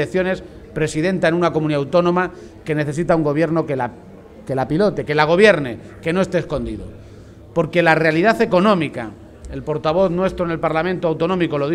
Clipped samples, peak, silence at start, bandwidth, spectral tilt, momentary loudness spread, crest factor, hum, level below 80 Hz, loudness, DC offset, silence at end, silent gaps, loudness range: under 0.1%; 0 dBFS; 0 s; 13 kHz; -6.5 dB/octave; 13 LU; 18 dB; none; -44 dBFS; -18 LUFS; under 0.1%; 0 s; none; 2 LU